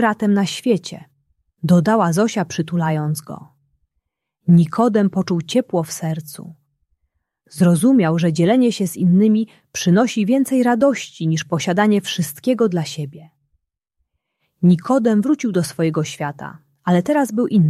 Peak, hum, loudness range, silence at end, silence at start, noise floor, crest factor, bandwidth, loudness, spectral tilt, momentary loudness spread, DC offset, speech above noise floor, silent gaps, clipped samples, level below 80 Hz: -2 dBFS; none; 4 LU; 0 s; 0 s; -75 dBFS; 16 dB; 14 kHz; -18 LUFS; -6.5 dB/octave; 13 LU; under 0.1%; 58 dB; none; under 0.1%; -62 dBFS